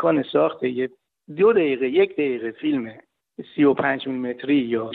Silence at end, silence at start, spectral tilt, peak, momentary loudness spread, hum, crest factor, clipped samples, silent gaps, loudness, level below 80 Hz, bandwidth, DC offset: 0 s; 0 s; -9.5 dB/octave; -6 dBFS; 12 LU; none; 16 dB; under 0.1%; none; -22 LUFS; -68 dBFS; 4.3 kHz; under 0.1%